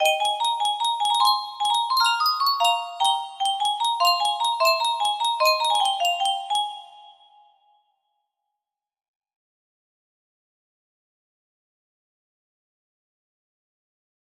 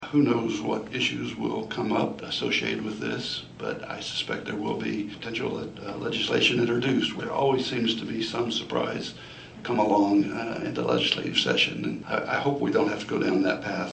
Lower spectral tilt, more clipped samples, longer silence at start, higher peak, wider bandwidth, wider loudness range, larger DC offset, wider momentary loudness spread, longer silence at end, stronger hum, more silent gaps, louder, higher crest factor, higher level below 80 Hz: second, 3 dB/octave vs -5 dB/octave; neither; about the same, 0 s vs 0 s; about the same, -8 dBFS vs -6 dBFS; first, 16 kHz vs 8.4 kHz; first, 8 LU vs 5 LU; neither; second, 5 LU vs 10 LU; first, 7.2 s vs 0 s; neither; neither; first, -21 LUFS vs -27 LUFS; about the same, 18 dB vs 20 dB; second, -78 dBFS vs -60 dBFS